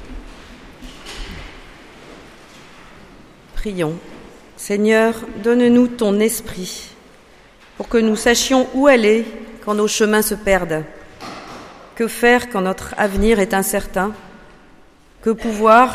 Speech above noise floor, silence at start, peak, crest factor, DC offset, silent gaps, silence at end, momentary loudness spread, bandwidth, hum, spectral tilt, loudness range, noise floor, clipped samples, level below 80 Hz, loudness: 31 dB; 0 s; 0 dBFS; 18 dB; under 0.1%; none; 0 s; 22 LU; 15.5 kHz; none; -4 dB/octave; 15 LU; -47 dBFS; under 0.1%; -38 dBFS; -17 LUFS